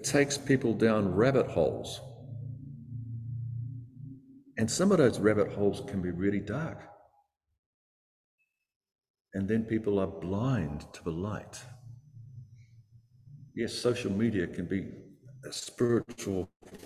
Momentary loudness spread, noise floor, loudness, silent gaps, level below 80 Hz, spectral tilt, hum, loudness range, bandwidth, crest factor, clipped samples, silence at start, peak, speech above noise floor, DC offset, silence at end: 21 LU; -71 dBFS; -30 LUFS; 7.59-8.38 s, 8.76-8.80 s, 9.10-9.14 s, 9.21-9.25 s, 16.56-16.60 s; -56 dBFS; -5.5 dB/octave; none; 9 LU; 14.5 kHz; 22 dB; under 0.1%; 0 s; -10 dBFS; 42 dB; under 0.1%; 0 s